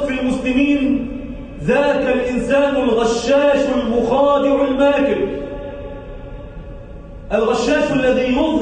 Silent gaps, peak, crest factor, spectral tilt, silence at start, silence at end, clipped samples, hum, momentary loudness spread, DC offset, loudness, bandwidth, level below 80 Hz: none; -6 dBFS; 12 dB; -5.5 dB/octave; 0 s; 0 s; under 0.1%; none; 19 LU; under 0.1%; -16 LUFS; 9.4 kHz; -36 dBFS